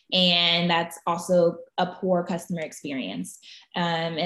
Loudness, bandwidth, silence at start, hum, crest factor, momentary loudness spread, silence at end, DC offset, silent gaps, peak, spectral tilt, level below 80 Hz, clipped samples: -24 LUFS; 12.5 kHz; 0.1 s; none; 20 dB; 14 LU; 0 s; under 0.1%; none; -6 dBFS; -4.5 dB/octave; -70 dBFS; under 0.1%